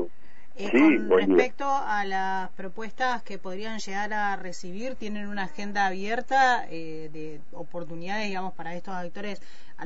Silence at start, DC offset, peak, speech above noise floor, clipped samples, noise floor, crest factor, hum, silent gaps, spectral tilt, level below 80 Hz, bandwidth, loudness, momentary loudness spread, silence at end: 0 s; 4%; -6 dBFS; 27 dB; under 0.1%; -55 dBFS; 20 dB; none; none; -5 dB/octave; -62 dBFS; 8 kHz; -27 LUFS; 17 LU; 0 s